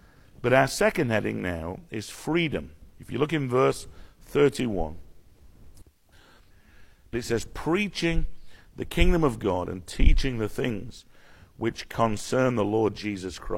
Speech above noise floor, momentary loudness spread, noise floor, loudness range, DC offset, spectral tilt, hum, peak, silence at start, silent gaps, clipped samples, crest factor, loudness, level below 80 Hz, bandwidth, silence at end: 31 dB; 13 LU; -56 dBFS; 5 LU; under 0.1%; -5.5 dB/octave; none; -4 dBFS; 0.4 s; none; under 0.1%; 22 dB; -27 LUFS; -32 dBFS; 16 kHz; 0 s